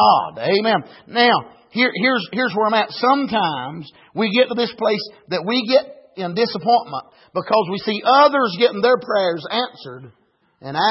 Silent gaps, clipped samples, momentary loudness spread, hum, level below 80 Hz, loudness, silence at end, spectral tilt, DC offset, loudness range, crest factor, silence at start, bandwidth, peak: none; under 0.1%; 13 LU; none; -68 dBFS; -18 LUFS; 0 s; -8 dB/octave; under 0.1%; 3 LU; 16 dB; 0 s; 5.8 kHz; -2 dBFS